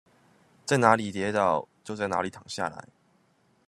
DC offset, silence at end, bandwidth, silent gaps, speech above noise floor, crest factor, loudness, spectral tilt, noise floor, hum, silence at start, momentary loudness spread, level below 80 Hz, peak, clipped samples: under 0.1%; 0.85 s; 13.5 kHz; none; 40 dB; 26 dB; -27 LUFS; -5 dB/octave; -66 dBFS; none; 0.65 s; 16 LU; -70 dBFS; -4 dBFS; under 0.1%